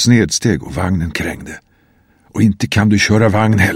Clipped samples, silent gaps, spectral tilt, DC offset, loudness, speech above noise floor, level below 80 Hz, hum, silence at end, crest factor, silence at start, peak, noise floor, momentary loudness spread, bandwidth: under 0.1%; none; -5 dB/octave; under 0.1%; -14 LUFS; 40 dB; -38 dBFS; none; 0 s; 14 dB; 0 s; 0 dBFS; -53 dBFS; 16 LU; 15.5 kHz